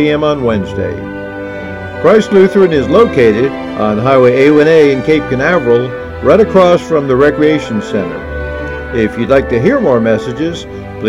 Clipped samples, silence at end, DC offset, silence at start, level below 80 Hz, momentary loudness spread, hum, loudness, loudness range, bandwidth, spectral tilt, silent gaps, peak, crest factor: 0.5%; 0 s; under 0.1%; 0 s; -32 dBFS; 13 LU; none; -10 LUFS; 4 LU; 11 kHz; -7 dB/octave; none; 0 dBFS; 10 dB